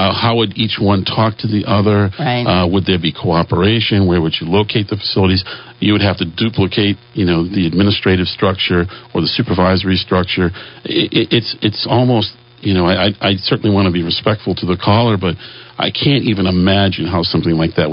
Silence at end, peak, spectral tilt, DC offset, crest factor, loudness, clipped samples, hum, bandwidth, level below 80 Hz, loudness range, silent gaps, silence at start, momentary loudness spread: 0 s; 0 dBFS; -10.5 dB/octave; under 0.1%; 14 dB; -14 LUFS; under 0.1%; none; 5.6 kHz; -42 dBFS; 1 LU; none; 0 s; 5 LU